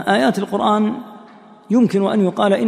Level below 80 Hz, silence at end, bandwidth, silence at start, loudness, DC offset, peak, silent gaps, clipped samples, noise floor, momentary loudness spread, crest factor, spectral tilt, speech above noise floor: -64 dBFS; 0 s; 13.5 kHz; 0 s; -17 LUFS; under 0.1%; -2 dBFS; none; under 0.1%; -43 dBFS; 7 LU; 16 dB; -6.5 dB/octave; 27 dB